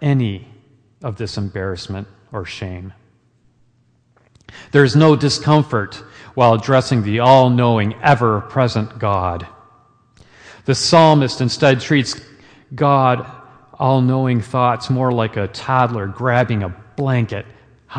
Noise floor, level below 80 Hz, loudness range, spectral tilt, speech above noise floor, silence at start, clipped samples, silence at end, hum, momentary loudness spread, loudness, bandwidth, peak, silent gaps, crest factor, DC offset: -58 dBFS; -50 dBFS; 12 LU; -6 dB/octave; 42 dB; 0 s; under 0.1%; 0 s; none; 18 LU; -16 LUFS; 9.8 kHz; 0 dBFS; none; 18 dB; under 0.1%